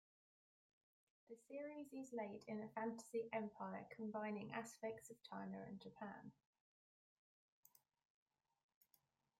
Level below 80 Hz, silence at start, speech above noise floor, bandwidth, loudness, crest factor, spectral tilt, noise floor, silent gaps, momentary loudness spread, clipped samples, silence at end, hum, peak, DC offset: under -90 dBFS; 1.3 s; 32 dB; 16 kHz; -51 LUFS; 20 dB; -5.5 dB/octave; -83 dBFS; none; 9 LU; under 0.1%; 3.1 s; none; -34 dBFS; under 0.1%